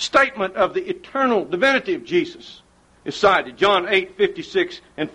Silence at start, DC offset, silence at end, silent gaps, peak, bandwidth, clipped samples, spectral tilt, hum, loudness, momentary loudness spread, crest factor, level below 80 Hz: 0 s; under 0.1%; 0.05 s; none; -4 dBFS; 11 kHz; under 0.1%; -4 dB/octave; none; -20 LUFS; 11 LU; 18 dB; -56 dBFS